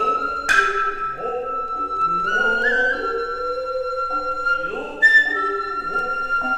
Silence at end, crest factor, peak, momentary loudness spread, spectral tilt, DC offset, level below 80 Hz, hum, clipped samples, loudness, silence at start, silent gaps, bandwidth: 0 s; 18 dB; -2 dBFS; 10 LU; -2.5 dB/octave; under 0.1%; -46 dBFS; none; under 0.1%; -20 LUFS; 0 s; none; 14 kHz